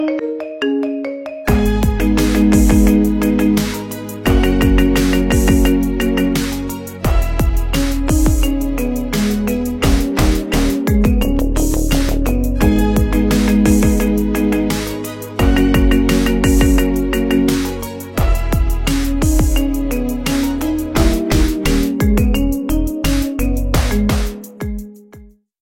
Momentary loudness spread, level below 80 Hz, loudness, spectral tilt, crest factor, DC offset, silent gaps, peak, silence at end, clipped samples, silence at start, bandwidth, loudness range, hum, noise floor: 8 LU; -18 dBFS; -16 LUFS; -6 dB/octave; 14 dB; under 0.1%; none; 0 dBFS; 0.35 s; under 0.1%; 0 s; 16.5 kHz; 3 LU; none; -42 dBFS